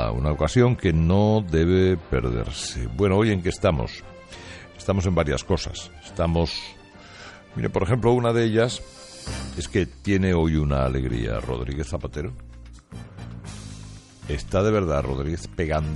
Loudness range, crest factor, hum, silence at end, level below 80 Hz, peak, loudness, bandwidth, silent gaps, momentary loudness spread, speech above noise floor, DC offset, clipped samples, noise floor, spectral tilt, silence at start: 7 LU; 18 dB; none; 0 s; -36 dBFS; -4 dBFS; -23 LUFS; 11.5 kHz; none; 20 LU; 21 dB; under 0.1%; under 0.1%; -44 dBFS; -6.5 dB/octave; 0 s